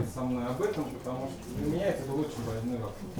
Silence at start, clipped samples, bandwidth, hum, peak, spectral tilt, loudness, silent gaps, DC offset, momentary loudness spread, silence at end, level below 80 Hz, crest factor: 0 s; under 0.1%; over 20 kHz; none; -18 dBFS; -6.5 dB/octave; -33 LUFS; none; under 0.1%; 6 LU; 0 s; -52 dBFS; 14 dB